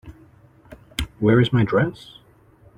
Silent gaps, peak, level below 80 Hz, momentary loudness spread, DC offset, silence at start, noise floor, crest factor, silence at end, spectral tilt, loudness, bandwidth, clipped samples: none; -4 dBFS; -42 dBFS; 14 LU; under 0.1%; 0.05 s; -52 dBFS; 20 dB; 0.85 s; -7 dB/octave; -20 LUFS; 16.5 kHz; under 0.1%